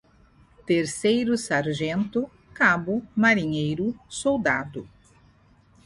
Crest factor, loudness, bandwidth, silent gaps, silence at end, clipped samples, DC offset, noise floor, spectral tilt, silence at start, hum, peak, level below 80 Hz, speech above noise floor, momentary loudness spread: 18 dB; -24 LUFS; 11.5 kHz; none; 1 s; under 0.1%; under 0.1%; -57 dBFS; -5 dB/octave; 0.65 s; none; -6 dBFS; -56 dBFS; 34 dB; 10 LU